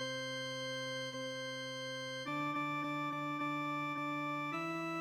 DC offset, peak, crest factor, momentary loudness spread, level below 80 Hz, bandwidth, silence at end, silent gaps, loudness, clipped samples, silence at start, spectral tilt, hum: under 0.1%; -30 dBFS; 10 dB; 4 LU; -82 dBFS; 16.5 kHz; 0 s; none; -39 LUFS; under 0.1%; 0 s; -4 dB/octave; none